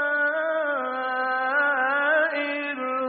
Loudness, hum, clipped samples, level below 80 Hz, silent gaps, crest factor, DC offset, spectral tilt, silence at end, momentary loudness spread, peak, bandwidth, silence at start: -24 LUFS; none; under 0.1%; -82 dBFS; none; 14 dB; under 0.1%; 1.5 dB/octave; 0 s; 6 LU; -10 dBFS; 4.6 kHz; 0 s